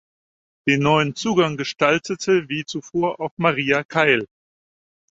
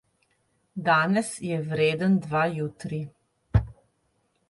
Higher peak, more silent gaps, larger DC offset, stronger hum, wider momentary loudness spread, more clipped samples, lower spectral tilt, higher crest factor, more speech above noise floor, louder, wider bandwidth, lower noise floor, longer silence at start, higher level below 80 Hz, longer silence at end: first, -2 dBFS vs -8 dBFS; first, 3.31-3.37 s, 3.85-3.89 s vs none; neither; neither; second, 9 LU vs 13 LU; neither; about the same, -5 dB/octave vs -6 dB/octave; about the same, 20 dB vs 18 dB; first, over 70 dB vs 46 dB; first, -20 LUFS vs -26 LUFS; second, 8 kHz vs 11.5 kHz; first, under -90 dBFS vs -71 dBFS; about the same, 0.65 s vs 0.75 s; second, -58 dBFS vs -42 dBFS; about the same, 0.9 s vs 0.8 s